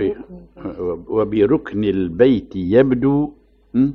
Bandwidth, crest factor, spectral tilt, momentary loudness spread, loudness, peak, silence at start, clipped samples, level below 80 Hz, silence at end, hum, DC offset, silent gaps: 5.4 kHz; 16 dB; -10 dB/octave; 12 LU; -18 LUFS; -2 dBFS; 0 s; under 0.1%; -44 dBFS; 0 s; none; under 0.1%; none